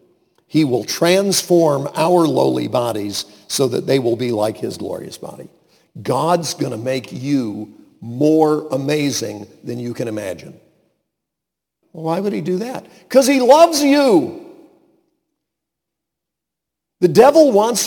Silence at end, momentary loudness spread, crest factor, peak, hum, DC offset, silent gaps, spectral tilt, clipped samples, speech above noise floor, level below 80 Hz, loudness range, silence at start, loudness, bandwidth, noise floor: 0 s; 18 LU; 18 dB; 0 dBFS; none; under 0.1%; none; -5 dB/octave; under 0.1%; 66 dB; -62 dBFS; 9 LU; 0.55 s; -16 LUFS; 19 kHz; -82 dBFS